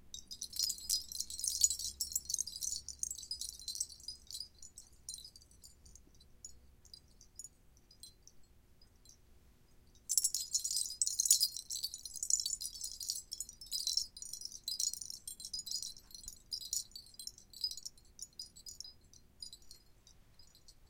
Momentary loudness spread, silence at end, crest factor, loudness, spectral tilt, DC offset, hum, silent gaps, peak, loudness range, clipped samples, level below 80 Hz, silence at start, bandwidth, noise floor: 23 LU; 0.05 s; 34 dB; -37 LUFS; 2 dB/octave; under 0.1%; none; none; -8 dBFS; 23 LU; under 0.1%; -66 dBFS; 0 s; 17 kHz; -65 dBFS